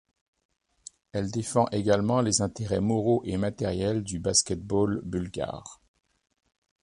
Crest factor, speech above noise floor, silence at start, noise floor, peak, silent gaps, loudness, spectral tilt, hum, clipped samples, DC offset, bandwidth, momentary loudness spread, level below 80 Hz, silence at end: 22 dB; 25 dB; 1.15 s; -52 dBFS; -8 dBFS; none; -27 LUFS; -4.5 dB/octave; none; under 0.1%; under 0.1%; 11.5 kHz; 10 LU; -50 dBFS; 1.1 s